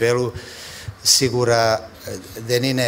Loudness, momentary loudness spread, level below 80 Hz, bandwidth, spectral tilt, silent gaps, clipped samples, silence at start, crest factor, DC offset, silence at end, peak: -18 LUFS; 19 LU; -48 dBFS; 16.5 kHz; -3 dB/octave; none; under 0.1%; 0 s; 18 dB; under 0.1%; 0 s; -2 dBFS